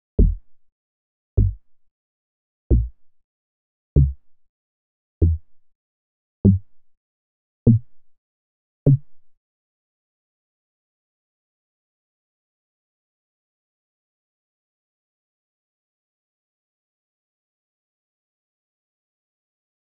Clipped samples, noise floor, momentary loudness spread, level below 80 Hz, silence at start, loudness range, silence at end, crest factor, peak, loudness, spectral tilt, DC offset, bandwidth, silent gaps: under 0.1%; under -90 dBFS; 7 LU; -32 dBFS; 0.2 s; 5 LU; 10.65 s; 26 dB; 0 dBFS; -21 LUFS; -18 dB/octave; 0.3%; 1.2 kHz; 0.72-1.37 s, 1.91-2.70 s, 3.24-3.96 s, 4.49-5.21 s, 5.75-6.44 s, 6.97-7.66 s, 8.18-8.86 s